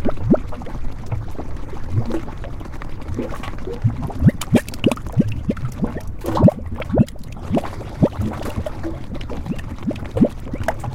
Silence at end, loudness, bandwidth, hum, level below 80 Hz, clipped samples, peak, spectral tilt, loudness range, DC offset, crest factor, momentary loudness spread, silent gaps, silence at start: 0 s; -22 LUFS; 16.5 kHz; none; -30 dBFS; under 0.1%; -2 dBFS; -7.5 dB/octave; 7 LU; under 0.1%; 18 dB; 14 LU; none; 0 s